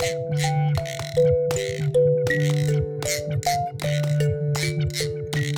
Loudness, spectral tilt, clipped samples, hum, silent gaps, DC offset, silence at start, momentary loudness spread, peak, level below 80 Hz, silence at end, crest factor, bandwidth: -23 LUFS; -5.5 dB/octave; under 0.1%; none; none; under 0.1%; 0 s; 6 LU; -8 dBFS; -46 dBFS; 0 s; 14 dB; 17.5 kHz